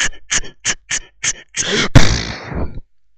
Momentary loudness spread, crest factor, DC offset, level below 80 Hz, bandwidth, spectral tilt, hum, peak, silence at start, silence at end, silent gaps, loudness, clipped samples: 13 LU; 16 dB; under 0.1%; -24 dBFS; 9.2 kHz; -3 dB/octave; none; 0 dBFS; 0 s; 0.35 s; none; -17 LUFS; 0.5%